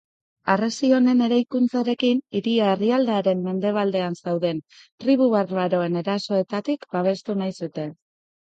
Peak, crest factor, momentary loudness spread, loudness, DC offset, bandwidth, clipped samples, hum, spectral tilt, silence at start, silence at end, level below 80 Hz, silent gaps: -6 dBFS; 16 dB; 9 LU; -22 LUFS; under 0.1%; 8 kHz; under 0.1%; none; -6.5 dB/octave; 0.45 s; 0.5 s; -72 dBFS; 4.92-4.98 s